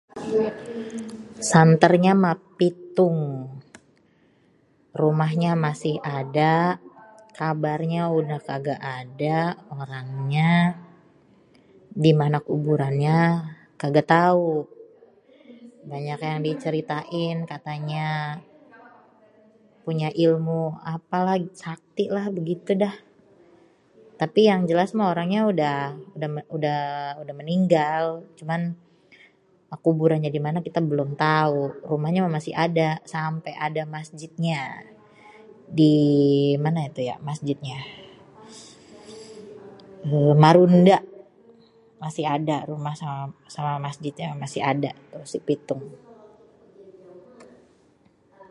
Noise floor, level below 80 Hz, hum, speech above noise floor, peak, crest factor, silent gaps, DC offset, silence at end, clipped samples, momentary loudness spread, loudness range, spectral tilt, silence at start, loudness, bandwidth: -61 dBFS; -68 dBFS; none; 38 dB; 0 dBFS; 24 dB; none; under 0.1%; 0.05 s; under 0.1%; 17 LU; 9 LU; -7 dB/octave; 0.15 s; -23 LUFS; 11 kHz